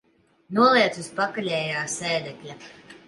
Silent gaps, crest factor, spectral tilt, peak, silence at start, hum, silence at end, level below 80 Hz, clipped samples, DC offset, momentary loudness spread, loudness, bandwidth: none; 18 dB; -3.5 dB/octave; -6 dBFS; 0.5 s; none; 0.1 s; -70 dBFS; under 0.1%; under 0.1%; 22 LU; -23 LUFS; 11.5 kHz